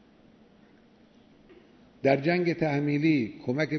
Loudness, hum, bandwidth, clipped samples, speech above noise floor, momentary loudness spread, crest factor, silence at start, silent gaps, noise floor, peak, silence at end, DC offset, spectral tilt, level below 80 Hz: -26 LUFS; none; 6.4 kHz; under 0.1%; 32 dB; 5 LU; 20 dB; 2.05 s; none; -58 dBFS; -8 dBFS; 0 s; under 0.1%; -8 dB/octave; -68 dBFS